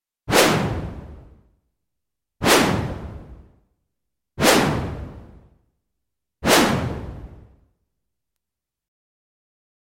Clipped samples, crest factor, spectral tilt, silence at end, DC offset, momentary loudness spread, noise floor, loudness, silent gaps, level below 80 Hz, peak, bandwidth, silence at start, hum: under 0.1%; 22 dB; -3.5 dB/octave; 2.5 s; under 0.1%; 22 LU; -86 dBFS; -19 LUFS; none; -42 dBFS; -2 dBFS; 16.5 kHz; 0.25 s; none